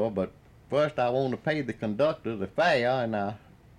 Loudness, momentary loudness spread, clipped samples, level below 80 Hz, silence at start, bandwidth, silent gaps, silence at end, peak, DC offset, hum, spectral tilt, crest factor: -28 LUFS; 9 LU; under 0.1%; -62 dBFS; 0 s; 10 kHz; none; 0.4 s; -12 dBFS; under 0.1%; none; -6.5 dB/octave; 16 dB